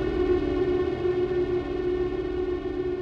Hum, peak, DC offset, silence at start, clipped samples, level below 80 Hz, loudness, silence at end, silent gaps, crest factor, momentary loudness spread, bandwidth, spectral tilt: none; -14 dBFS; under 0.1%; 0 s; under 0.1%; -40 dBFS; -27 LUFS; 0 s; none; 12 dB; 4 LU; 6.2 kHz; -8.5 dB/octave